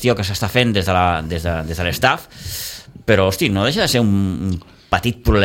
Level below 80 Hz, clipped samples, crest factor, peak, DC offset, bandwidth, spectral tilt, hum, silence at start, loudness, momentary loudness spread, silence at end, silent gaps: -32 dBFS; under 0.1%; 16 dB; 0 dBFS; under 0.1%; 17 kHz; -5 dB/octave; none; 0 s; -18 LUFS; 11 LU; 0 s; none